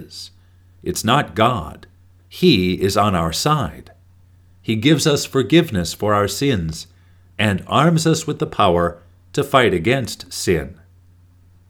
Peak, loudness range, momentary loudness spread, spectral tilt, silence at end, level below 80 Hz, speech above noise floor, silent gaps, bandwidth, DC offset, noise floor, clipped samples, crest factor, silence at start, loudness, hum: 0 dBFS; 2 LU; 17 LU; -5 dB/octave; 0.95 s; -44 dBFS; 32 dB; none; 19 kHz; under 0.1%; -50 dBFS; under 0.1%; 20 dB; 0 s; -18 LUFS; none